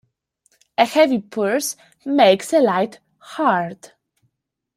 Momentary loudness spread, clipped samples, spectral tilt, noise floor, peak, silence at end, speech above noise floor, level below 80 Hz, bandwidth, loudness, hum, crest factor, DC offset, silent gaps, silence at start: 13 LU; under 0.1%; -4 dB/octave; -75 dBFS; -2 dBFS; 0.9 s; 57 dB; -68 dBFS; 16 kHz; -18 LUFS; none; 18 dB; under 0.1%; none; 0.8 s